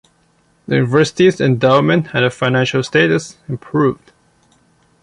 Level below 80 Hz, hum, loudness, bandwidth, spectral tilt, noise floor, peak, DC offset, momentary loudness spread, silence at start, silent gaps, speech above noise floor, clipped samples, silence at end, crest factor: -52 dBFS; none; -15 LUFS; 11 kHz; -6 dB/octave; -57 dBFS; -2 dBFS; under 0.1%; 8 LU; 0.7 s; none; 42 dB; under 0.1%; 1.1 s; 14 dB